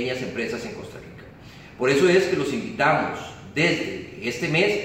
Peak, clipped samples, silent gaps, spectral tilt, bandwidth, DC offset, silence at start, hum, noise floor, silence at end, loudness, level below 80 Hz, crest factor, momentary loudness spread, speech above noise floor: -8 dBFS; under 0.1%; none; -5 dB/octave; 15.5 kHz; under 0.1%; 0 s; none; -44 dBFS; 0 s; -23 LUFS; -56 dBFS; 16 dB; 23 LU; 21 dB